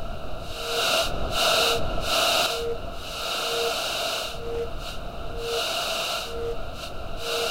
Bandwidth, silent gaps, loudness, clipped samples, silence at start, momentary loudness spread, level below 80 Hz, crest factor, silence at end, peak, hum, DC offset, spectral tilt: 16 kHz; none; -26 LUFS; under 0.1%; 0 s; 14 LU; -38 dBFS; 18 dB; 0 s; -8 dBFS; none; under 0.1%; -2 dB/octave